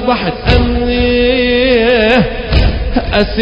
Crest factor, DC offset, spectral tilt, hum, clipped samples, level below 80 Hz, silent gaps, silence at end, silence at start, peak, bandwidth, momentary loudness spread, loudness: 10 dB; under 0.1%; -7.5 dB/octave; none; 0.1%; -18 dBFS; none; 0 s; 0 s; 0 dBFS; 8 kHz; 5 LU; -11 LUFS